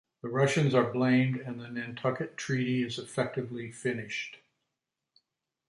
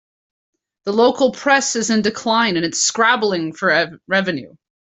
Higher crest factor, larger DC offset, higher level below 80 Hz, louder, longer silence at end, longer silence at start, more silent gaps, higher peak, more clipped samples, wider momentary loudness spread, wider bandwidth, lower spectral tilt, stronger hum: about the same, 20 dB vs 16 dB; neither; second, -72 dBFS vs -62 dBFS; second, -30 LUFS vs -17 LUFS; first, 1.3 s vs 0.35 s; second, 0.25 s vs 0.85 s; neither; second, -12 dBFS vs -2 dBFS; neither; first, 12 LU vs 6 LU; first, 11.5 kHz vs 8.4 kHz; first, -6 dB/octave vs -2.5 dB/octave; neither